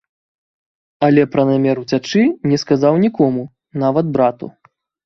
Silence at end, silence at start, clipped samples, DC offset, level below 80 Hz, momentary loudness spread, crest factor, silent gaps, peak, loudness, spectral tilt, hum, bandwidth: 0.55 s; 1 s; under 0.1%; under 0.1%; -56 dBFS; 8 LU; 16 dB; none; 0 dBFS; -16 LUFS; -7 dB/octave; none; 7.2 kHz